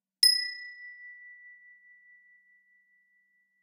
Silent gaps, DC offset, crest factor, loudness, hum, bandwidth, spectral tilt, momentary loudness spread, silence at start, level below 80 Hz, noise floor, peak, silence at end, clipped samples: none; under 0.1%; 26 dB; -24 LUFS; none; 15.5 kHz; 7 dB/octave; 28 LU; 0.2 s; under -90 dBFS; -71 dBFS; -8 dBFS; 2.5 s; under 0.1%